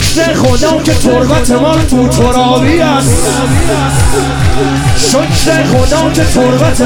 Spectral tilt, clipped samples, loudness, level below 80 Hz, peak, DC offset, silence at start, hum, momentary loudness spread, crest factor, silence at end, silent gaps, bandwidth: -5 dB/octave; under 0.1%; -9 LUFS; -20 dBFS; 0 dBFS; under 0.1%; 0 s; none; 2 LU; 8 dB; 0 s; none; 18.5 kHz